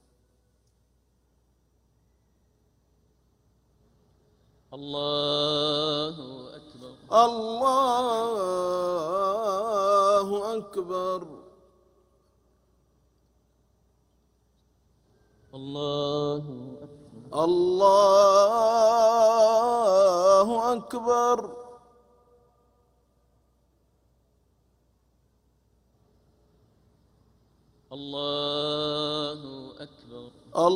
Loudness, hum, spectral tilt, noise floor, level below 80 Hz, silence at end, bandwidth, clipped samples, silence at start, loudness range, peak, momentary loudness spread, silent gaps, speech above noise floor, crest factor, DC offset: -24 LUFS; none; -4.5 dB/octave; -68 dBFS; -66 dBFS; 0 s; 16 kHz; under 0.1%; 4.7 s; 16 LU; -6 dBFS; 23 LU; none; 45 dB; 22 dB; under 0.1%